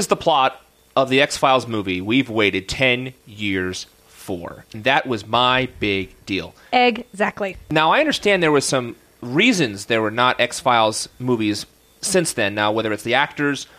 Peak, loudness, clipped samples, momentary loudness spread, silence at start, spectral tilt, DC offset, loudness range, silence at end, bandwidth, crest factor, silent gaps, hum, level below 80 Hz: 0 dBFS; -19 LUFS; under 0.1%; 12 LU; 0 s; -3.5 dB/octave; under 0.1%; 4 LU; 0.15 s; 15.5 kHz; 18 dB; none; none; -52 dBFS